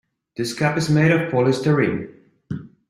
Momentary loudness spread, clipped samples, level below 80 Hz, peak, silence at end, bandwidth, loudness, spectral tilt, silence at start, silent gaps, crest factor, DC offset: 17 LU; under 0.1%; -56 dBFS; -4 dBFS; 0.25 s; 12.5 kHz; -20 LUFS; -6.5 dB/octave; 0.4 s; none; 18 dB; under 0.1%